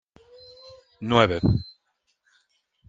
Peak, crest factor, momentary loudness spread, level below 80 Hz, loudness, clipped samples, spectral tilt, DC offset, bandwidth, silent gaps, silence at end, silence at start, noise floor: -2 dBFS; 24 dB; 26 LU; -46 dBFS; -22 LUFS; under 0.1%; -7 dB/octave; under 0.1%; 7.6 kHz; none; 1.2 s; 1 s; -73 dBFS